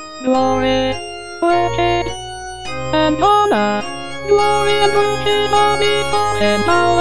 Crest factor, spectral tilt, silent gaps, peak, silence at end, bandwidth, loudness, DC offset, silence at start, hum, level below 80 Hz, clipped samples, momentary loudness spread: 14 dB; -4.5 dB/octave; none; 0 dBFS; 0 s; 10.5 kHz; -15 LUFS; 3%; 0 s; none; -38 dBFS; under 0.1%; 12 LU